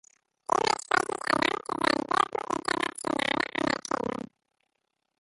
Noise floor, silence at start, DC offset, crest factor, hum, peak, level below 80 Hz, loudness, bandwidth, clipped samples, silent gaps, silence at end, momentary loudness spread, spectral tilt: -80 dBFS; 0.5 s; under 0.1%; 20 dB; none; -10 dBFS; -64 dBFS; -28 LUFS; 12 kHz; under 0.1%; none; 1 s; 6 LU; -3 dB/octave